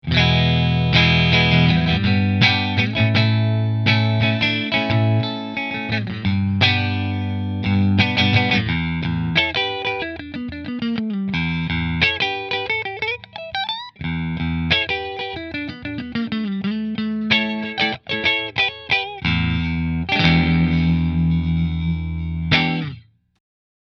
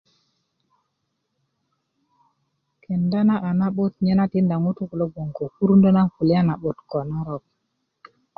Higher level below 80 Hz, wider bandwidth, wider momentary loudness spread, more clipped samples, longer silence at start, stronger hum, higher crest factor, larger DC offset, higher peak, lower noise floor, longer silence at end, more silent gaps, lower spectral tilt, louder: first, -36 dBFS vs -56 dBFS; first, 6.6 kHz vs 5 kHz; about the same, 10 LU vs 12 LU; neither; second, 0.05 s vs 2.9 s; neither; about the same, 20 dB vs 16 dB; neither; first, 0 dBFS vs -6 dBFS; second, -40 dBFS vs -76 dBFS; second, 0.85 s vs 1 s; neither; second, -6.5 dB/octave vs -11.5 dB/octave; about the same, -19 LUFS vs -21 LUFS